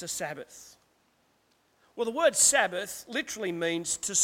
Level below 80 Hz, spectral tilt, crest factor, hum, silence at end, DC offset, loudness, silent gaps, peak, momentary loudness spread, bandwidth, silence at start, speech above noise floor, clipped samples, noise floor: -68 dBFS; -1 dB/octave; 22 dB; none; 0 s; under 0.1%; -27 LUFS; none; -8 dBFS; 18 LU; 17 kHz; 0 s; 40 dB; under 0.1%; -69 dBFS